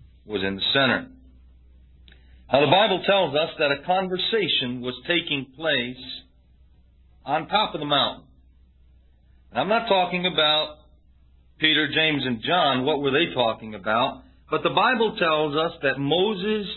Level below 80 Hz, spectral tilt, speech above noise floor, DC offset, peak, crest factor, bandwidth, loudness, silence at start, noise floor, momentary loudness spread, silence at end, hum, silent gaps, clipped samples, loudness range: -54 dBFS; -9 dB/octave; 33 dB; under 0.1%; -2 dBFS; 22 dB; 4.3 kHz; -22 LUFS; 0.25 s; -55 dBFS; 9 LU; 0 s; none; none; under 0.1%; 5 LU